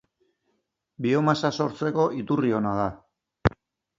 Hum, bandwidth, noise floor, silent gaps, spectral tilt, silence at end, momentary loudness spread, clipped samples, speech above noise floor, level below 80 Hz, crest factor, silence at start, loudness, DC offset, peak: none; 7.8 kHz; -75 dBFS; none; -7 dB/octave; 0.5 s; 6 LU; under 0.1%; 51 dB; -46 dBFS; 22 dB; 1 s; -25 LUFS; under 0.1%; -4 dBFS